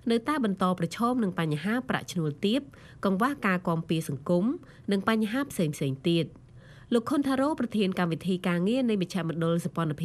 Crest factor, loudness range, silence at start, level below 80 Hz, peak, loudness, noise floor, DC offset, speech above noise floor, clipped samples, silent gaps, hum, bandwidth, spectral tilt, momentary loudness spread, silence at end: 18 dB; 1 LU; 0.05 s; -62 dBFS; -8 dBFS; -28 LUFS; -50 dBFS; under 0.1%; 23 dB; under 0.1%; none; none; 14 kHz; -6.5 dB/octave; 5 LU; 0 s